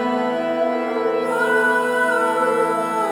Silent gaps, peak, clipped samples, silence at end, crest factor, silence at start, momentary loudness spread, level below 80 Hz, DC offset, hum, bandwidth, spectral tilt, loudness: none; -6 dBFS; under 0.1%; 0 s; 12 dB; 0 s; 4 LU; -66 dBFS; under 0.1%; none; 19.5 kHz; -4 dB/octave; -19 LUFS